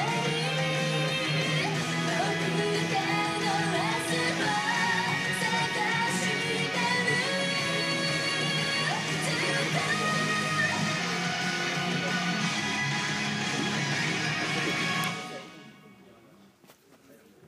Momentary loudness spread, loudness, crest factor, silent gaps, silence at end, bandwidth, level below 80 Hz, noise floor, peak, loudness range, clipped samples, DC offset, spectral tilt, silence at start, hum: 2 LU; -27 LUFS; 14 dB; none; 0.35 s; 15.5 kHz; -68 dBFS; -57 dBFS; -14 dBFS; 3 LU; under 0.1%; under 0.1%; -3.5 dB/octave; 0 s; none